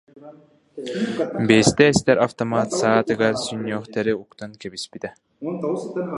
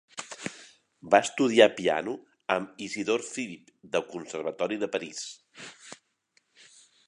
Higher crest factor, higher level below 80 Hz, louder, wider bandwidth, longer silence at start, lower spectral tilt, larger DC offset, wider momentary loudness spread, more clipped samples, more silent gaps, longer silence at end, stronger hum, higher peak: about the same, 22 dB vs 26 dB; first, -52 dBFS vs -74 dBFS; first, -20 LUFS vs -28 LUFS; about the same, 11.5 kHz vs 11 kHz; about the same, 0.15 s vs 0.15 s; first, -5 dB/octave vs -3.5 dB/octave; neither; second, 18 LU vs 23 LU; neither; neither; second, 0 s vs 1.15 s; neither; first, 0 dBFS vs -4 dBFS